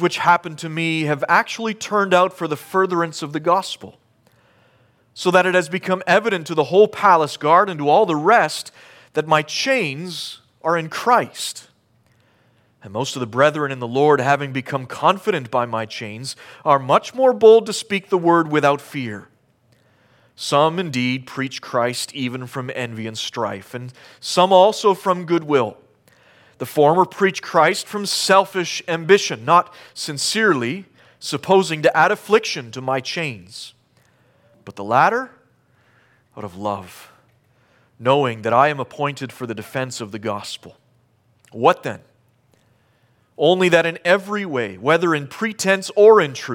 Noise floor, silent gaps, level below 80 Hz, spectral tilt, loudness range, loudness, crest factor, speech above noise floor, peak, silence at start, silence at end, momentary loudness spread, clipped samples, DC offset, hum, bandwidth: -60 dBFS; none; -70 dBFS; -4.5 dB/octave; 7 LU; -18 LUFS; 18 dB; 41 dB; 0 dBFS; 0 s; 0 s; 14 LU; under 0.1%; under 0.1%; none; 17 kHz